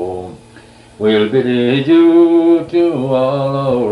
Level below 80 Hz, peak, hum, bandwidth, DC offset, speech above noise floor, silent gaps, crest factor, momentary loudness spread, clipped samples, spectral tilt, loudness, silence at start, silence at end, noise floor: -50 dBFS; -2 dBFS; none; 5 kHz; under 0.1%; 29 dB; none; 12 dB; 10 LU; under 0.1%; -8 dB/octave; -12 LUFS; 0 s; 0 s; -40 dBFS